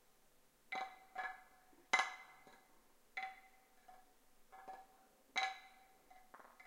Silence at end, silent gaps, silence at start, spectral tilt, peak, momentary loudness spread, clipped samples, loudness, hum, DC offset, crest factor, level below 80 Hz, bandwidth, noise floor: 0 s; none; 0.7 s; 0.5 dB/octave; -18 dBFS; 28 LU; under 0.1%; -43 LUFS; none; under 0.1%; 32 dB; -78 dBFS; 16 kHz; -71 dBFS